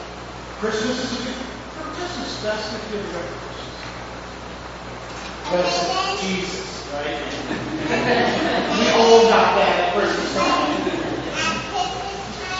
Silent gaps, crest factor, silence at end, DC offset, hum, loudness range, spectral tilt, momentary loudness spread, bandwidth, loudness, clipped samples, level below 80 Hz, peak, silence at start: none; 22 dB; 0 s; under 0.1%; 60 Hz at -40 dBFS; 12 LU; -4 dB/octave; 17 LU; 8 kHz; -21 LUFS; under 0.1%; -44 dBFS; 0 dBFS; 0 s